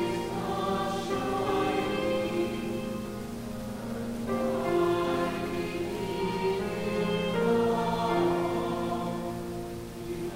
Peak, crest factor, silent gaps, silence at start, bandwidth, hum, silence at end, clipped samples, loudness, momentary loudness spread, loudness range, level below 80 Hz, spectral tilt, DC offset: -14 dBFS; 14 dB; none; 0 s; 16 kHz; none; 0 s; under 0.1%; -30 LUFS; 10 LU; 3 LU; -50 dBFS; -6 dB/octave; under 0.1%